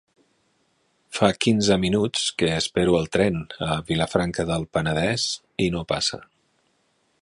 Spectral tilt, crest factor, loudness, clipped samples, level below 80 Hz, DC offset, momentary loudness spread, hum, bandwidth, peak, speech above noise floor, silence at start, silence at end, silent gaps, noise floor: -4.5 dB/octave; 22 dB; -23 LUFS; under 0.1%; -46 dBFS; under 0.1%; 6 LU; none; 11.5 kHz; -2 dBFS; 45 dB; 1.1 s; 0.95 s; none; -68 dBFS